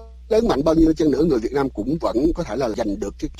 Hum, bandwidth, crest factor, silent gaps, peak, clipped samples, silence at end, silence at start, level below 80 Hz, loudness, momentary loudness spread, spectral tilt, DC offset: none; 12.5 kHz; 14 dB; none; -6 dBFS; under 0.1%; 0 s; 0 s; -34 dBFS; -20 LUFS; 7 LU; -7 dB/octave; under 0.1%